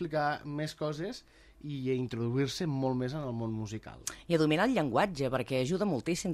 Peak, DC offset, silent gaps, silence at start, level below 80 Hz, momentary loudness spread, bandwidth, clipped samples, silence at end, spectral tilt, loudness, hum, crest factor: -14 dBFS; under 0.1%; none; 0 s; -60 dBFS; 13 LU; 14 kHz; under 0.1%; 0 s; -5.5 dB/octave; -32 LUFS; none; 18 dB